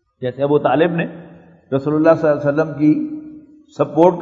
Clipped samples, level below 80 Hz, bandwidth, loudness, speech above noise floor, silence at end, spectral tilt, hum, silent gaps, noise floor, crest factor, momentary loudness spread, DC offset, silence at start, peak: under 0.1%; -60 dBFS; 7 kHz; -17 LUFS; 23 dB; 0 s; -9 dB/octave; none; none; -38 dBFS; 16 dB; 13 LU; under 0.1%; 0.2 s; 0 dBFS